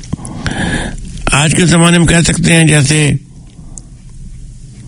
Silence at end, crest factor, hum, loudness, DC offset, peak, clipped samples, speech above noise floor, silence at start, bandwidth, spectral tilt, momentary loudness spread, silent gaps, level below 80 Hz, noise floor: 0 s; 12 dB; none; -10 LUFS; under 0.1%; 0 dBFS; 0.2%; 23 dB; 0 s; 11 kHz; -4.5 dB/octave; 13 LU; none; -26 dBFS; -31 dBFS